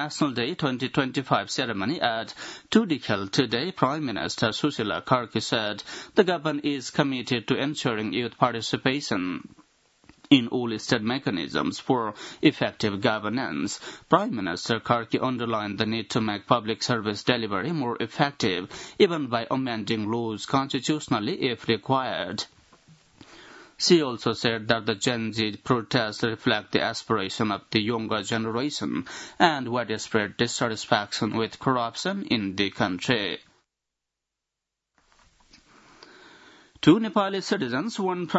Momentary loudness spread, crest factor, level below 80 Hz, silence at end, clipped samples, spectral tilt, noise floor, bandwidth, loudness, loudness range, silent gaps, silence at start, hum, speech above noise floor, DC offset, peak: 6 LU; 24 dB; -64 dBFS; 0 s; under 0.1%; -4.5 dB/octave; -86 dBFS; 8 kHz; -26 LUFS; 2 LU; none; 0 s; none; 60 dB; under 0.1%; -2 dBFS